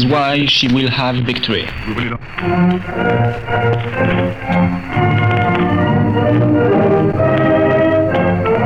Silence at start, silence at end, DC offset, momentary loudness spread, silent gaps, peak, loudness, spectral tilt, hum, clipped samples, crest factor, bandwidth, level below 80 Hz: 0 s; 0 s; 1%; 6 LU; none; -4 dBFS; -14 LUFS; -7 dB/octave; none; under 0.1%; 10 dB; 7.4 kHz; -36 dBFS